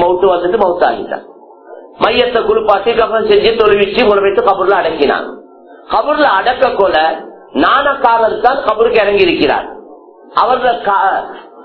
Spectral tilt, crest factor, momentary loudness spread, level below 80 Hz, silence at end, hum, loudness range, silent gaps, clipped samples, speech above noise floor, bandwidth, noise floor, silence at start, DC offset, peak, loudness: -7 dB/octave; 12 dB; 8 LU; -42 dBFS; 0 s; none; 2 LU; none; 0.2%; 25 dB; 5.4 kHz; -37 dBFS; 0 s; under 0.1%; 0 dBFS; -11 LUFS